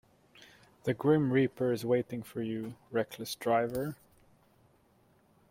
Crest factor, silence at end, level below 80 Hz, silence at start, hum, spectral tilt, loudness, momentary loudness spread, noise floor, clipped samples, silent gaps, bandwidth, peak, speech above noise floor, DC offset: 20 dB; 1.55 s; -68 dBFS; 0.4 s; none; -6.5 dB/octave; -32 LUFS; 12 LU; -67 dBFS; under 0.1%; none; 16.5 kHz; -14 dBFS; 36 dB; under 0.1%